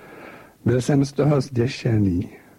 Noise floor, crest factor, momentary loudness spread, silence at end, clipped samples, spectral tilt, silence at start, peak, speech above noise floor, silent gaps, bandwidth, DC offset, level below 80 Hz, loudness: -43 dBFS; 16 dB; 8 LU; 0.2 s; under 0.1%; -7.5 dB/octave; 0 s; -6 dBFS; 23 dB; none; 12.5 kHz; under 0.1%; -48 dBFS; -21 LUFS